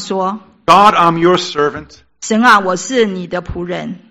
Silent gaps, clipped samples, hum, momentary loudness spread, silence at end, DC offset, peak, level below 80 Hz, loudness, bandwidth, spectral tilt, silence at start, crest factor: none; 1%; none; 14 LU; 0.15 s; under 0.1%; 0 dBFS; -42 dBFS; -12 LUFS; 17 kHz; -4.5 dB/octave; 0 s; 14 dB